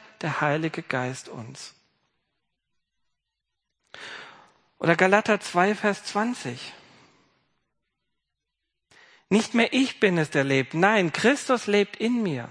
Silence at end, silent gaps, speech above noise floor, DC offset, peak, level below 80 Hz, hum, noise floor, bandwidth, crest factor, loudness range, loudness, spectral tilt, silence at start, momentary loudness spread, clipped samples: 0 s; none; 59 dB; under 0.1%; -2 dBFS; -74 dBFS; none; -83 dBFS; 10.5 kHz; 24 dB; 15 LU; -23 LUFS; -5 dB/octave; 0.2 s; 19 LU; under 0.1%